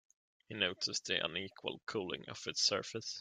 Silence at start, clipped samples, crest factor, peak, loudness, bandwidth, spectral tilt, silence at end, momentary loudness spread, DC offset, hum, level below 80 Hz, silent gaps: 0.5 s; under 0.1%; 24 dB; -16 dBFS; -37 LUFS; 12 kHz; -2 dB/octave; 0 s; 10 LU; under 0.1%; none; -78 dBFS; none